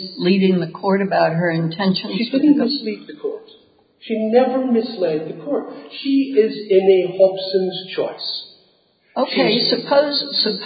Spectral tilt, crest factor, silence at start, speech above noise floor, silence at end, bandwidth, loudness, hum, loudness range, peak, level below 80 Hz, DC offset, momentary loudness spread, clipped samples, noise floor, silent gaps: -11 dB/octave; 16 dB; 0 s; 40 dB; 0 s; 5 kHz; -18 LUFS; none; 3 LU; -2 dBFS; -70 dBFS; under 0.1%; 11 LU; under 0.1%; -58 dBFS; none